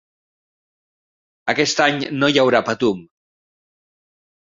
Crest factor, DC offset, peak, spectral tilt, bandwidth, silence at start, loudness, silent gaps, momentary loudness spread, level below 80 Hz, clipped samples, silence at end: 20 dB; under 0.1%; -2 dBFS; -4 dB/octave; 7.8 kHz; 1.45 s; -18 LUFS; none; 8 LU; -60 dBFS; under 0.1%; 1.45 s